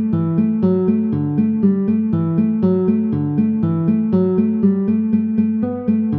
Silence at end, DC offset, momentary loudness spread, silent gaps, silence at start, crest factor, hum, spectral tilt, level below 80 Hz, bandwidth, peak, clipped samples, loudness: 0 s; under 0.1%; 2 LU; none; 0 s; 12 dB; none; -13 dB/octave; -52 dBFS; 3.5 kHz; -4 dBFS; under 0.1%; -17 LUFS